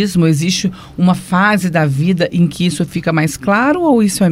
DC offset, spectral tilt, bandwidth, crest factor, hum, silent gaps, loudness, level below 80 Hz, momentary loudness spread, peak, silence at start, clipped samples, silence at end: under 0.1%; -5.5 dB/octave; 16 kHz; 12 dB; none; none; -14 LUFS; -44 dBFS; 4 LU; 0 dBFS; 0 s; under 0.1%; 0 s